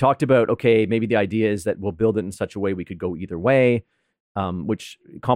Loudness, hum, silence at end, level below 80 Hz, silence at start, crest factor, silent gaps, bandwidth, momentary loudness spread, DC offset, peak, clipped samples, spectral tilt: -21 LUFS; none; 0 s; -54 dBFS; 0 s; 16 dB; 4.20-4.35 s; 13.5 kHz; 11 LU; under 0.1%; -6 dBFS; under 0.1%; -7 dB/octave